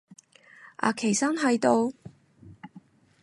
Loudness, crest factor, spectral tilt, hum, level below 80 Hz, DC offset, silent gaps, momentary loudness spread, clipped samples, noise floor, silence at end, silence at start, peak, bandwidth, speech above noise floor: -25 LUFS; 22 dB; -4 dB/octave; none; -70 dBFS; under 0.1%; none; 25 LU; under 0.1%; -54 dBFS; 0.45 s; 0.65 s; -6 dBFS; 11.5 kHz; 30 dB